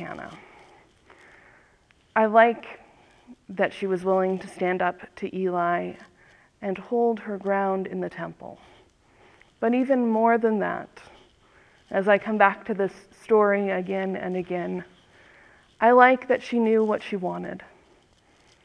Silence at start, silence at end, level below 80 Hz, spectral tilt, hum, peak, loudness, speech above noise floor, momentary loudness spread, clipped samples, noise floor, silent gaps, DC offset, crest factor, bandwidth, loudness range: 0 s; 1 s; -66 dBFS; -7 dB/octave; none; -2 dBFS; -24 LUFS; 37 dB; 17 LU; under 0.1%; -61 dBFS; none; under 0.1%; 24 dB; 10.5 kHz; 5 LU